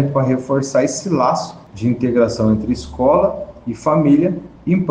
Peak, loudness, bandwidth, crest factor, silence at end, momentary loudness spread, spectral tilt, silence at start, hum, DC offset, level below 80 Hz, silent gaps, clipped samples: -2 dBFS; -17 LUFS; 9.8 kHz; 14 dB; 0 s; 9 LU; -7 dB/octave; 0 s; none; under 0.1%; -42 dBFS; none; under 0.1%